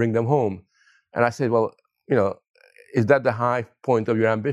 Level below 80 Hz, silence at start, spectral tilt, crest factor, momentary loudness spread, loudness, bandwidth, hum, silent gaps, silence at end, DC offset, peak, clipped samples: -70 dBFS; 0 s; -8 dB/octave; 20 dB; 9 LU; -22 LUFS; 11 kHz; none; 2.50-2.54 s; 0 s; under 0.1%; -4 dBFS; under 0.1%